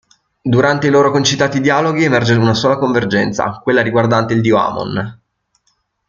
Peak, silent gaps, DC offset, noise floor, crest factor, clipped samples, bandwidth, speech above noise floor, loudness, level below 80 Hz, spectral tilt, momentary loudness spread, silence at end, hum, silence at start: 0 dBFS; none; under 0.1%; -64 dBFS; 14 dB; under 0.1%; 7.6 kHz; 51 dB; -14 LUFS; -50 dBFS; -5.5 dB/octave; 7 LU; 0.95 s; none; 0.45 s